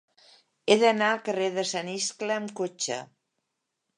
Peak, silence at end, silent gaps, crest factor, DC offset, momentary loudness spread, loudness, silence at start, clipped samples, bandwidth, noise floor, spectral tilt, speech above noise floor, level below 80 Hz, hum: -4 dBFS; 0.95 s; none; 24 dB; under 0.1%; 11 LU; -27 LUFS; 0.65 s; under 0.1%; 11 kHz; -82 dBFS; -3 dB/octave; 55 dB; -82 dBFS; none